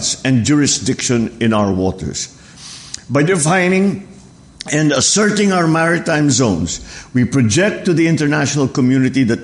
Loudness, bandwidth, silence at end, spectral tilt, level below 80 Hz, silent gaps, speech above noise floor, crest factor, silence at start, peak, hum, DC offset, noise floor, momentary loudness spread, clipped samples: -14 LUFS; 11.5 kHz; 0 s; -4.5 dB/octave; -44 dBFS; none; 26 dB; 12 dB; 0 s; -4 dBFS; none; under 0.1%; -40 dBFS; 12 LU; under 0.1%